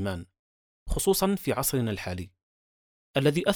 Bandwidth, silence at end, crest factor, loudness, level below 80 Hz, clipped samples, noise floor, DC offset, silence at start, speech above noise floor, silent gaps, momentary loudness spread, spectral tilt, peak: over 20 kHz; 0 s; 20 dB; -27 LUFS; -44 dBFS; under 0.1%; under -90 dBFS; under 0.1%; 0 s; over 63 dB; 0.39-0.86 s, 2.43-3.14 s; 14 LU; -4.5 dB/octave; -8 dBFS